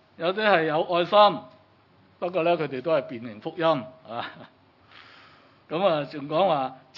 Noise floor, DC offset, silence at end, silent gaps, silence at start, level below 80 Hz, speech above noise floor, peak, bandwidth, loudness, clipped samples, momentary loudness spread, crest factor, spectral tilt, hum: -58 dBFS; under 0.1%; 0.2 s; none; 0.2 s; -80 dBFS; 34 dB; -4 dBFS; 6 kHz; -24 LUFS; under 0.1%; 16 LU; 22 dB; -7 dB/octave; none